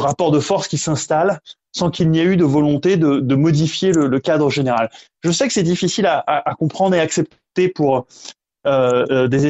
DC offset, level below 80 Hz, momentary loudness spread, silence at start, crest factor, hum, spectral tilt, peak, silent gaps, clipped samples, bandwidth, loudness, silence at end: under 0.1%; -52 dBFS; 7 LU; 0 s; 14 dB; none; -5.5 dB/octave; -2 dBFS; none; under 0.1%; 8.2 kHz; -17 LUFS; 0 s